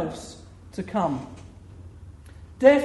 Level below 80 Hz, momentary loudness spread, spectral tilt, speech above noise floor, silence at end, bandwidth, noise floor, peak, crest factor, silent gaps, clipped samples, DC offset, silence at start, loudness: -50 dBFS; 25 LU; -6 dB/octave; 23 dB; 0 s; 11.5 kHz; -45 dBFS; -2 dBFS; 22 dB; none; under 0.1%; under 0.1%; 0 s; -25 LUFS